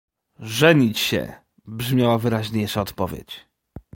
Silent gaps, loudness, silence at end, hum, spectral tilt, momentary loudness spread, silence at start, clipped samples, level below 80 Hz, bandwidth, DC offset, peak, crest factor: none; -21 LUFS; 0.15 s; none; -5.5 dB/octave; 22 LU; 0.4 s; under 0.1%; -50 dBFS; 17 kHz; under 0.1%; -2 dBFS; 20 dB